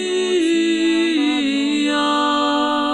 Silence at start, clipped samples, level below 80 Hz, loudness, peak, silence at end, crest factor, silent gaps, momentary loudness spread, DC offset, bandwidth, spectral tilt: 0 s; under 0.1%; -56 dBFS; -17 LUFS; -6 dBFS; 0 s; 10 dB; none; 2 LU; under 0.1%; 11.5 kHz; -2.5 dB/octave